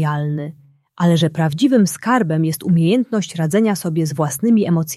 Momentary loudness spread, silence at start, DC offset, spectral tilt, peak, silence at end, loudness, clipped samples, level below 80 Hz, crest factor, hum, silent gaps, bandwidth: 6 LU; 0 s; under 0.1%; -6 dB/octave; -4 dBFS; 0 s; -17 LUFS; under 0.1%; -60 dBFS; 14 dB; none; none; 14 kHz